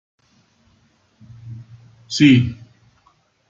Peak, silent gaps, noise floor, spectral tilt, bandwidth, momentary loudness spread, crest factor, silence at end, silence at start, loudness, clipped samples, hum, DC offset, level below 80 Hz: -2 dBFS; none; -60 dBFS; -5.5 dB/octave; 7.8 kHz; 26 LU; 20 dB; 0.95 s; 1.45 s; -15 LUFS; under 0.1%; none; under 0.1%; -56 dBFS